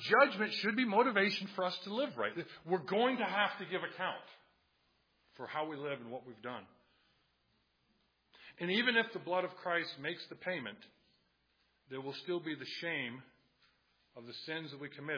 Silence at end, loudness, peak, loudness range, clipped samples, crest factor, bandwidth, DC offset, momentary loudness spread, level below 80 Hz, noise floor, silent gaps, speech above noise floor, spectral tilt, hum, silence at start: 0 s; -36 LUFS; -14 dBFS; 12 LU; under 0.1%; 24 dB; 5.4 kHz; under 0.1%; 17 LU; -88 dBFS; -77 dBFS; none; 41 dB; -2 dB/octave; none; 0 s